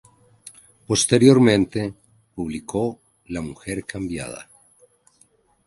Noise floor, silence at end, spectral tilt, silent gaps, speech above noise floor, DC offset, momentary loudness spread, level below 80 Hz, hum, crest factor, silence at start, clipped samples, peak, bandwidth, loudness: -60 dBFS; 1.25 s; -5 dB/octave; none; 40 dB; under 0.1%; 19 LU; -50 dBFS; none; 22 dB; 0.45 s; under 0.1%; 0 dBFS; 11.5 kHz; -21 LUFS